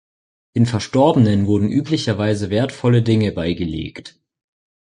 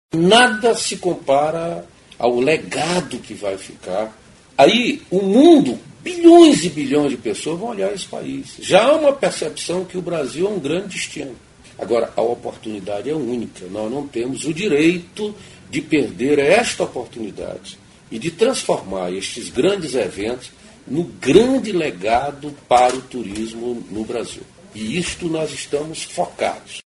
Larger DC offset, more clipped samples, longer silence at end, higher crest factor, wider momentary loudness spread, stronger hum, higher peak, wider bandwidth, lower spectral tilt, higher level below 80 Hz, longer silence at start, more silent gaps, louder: neither; neither; first, 0.9 s vs 0.1 s; about the same, 16 dB vs 18 dB; second, 10 LU vs 16 LU; neither; about the same, -2 dBFS vs 0 dBFS; about the same, 10.5 kHz vs 11.5 kHz; first, -7 dB/octave vs -4.5 dB/octave; first, -42 dBFS vs -52 dBFS; first, 0.55 s vs 0.15 s; neither; about the same, -18 LUFS vs -18 LUFS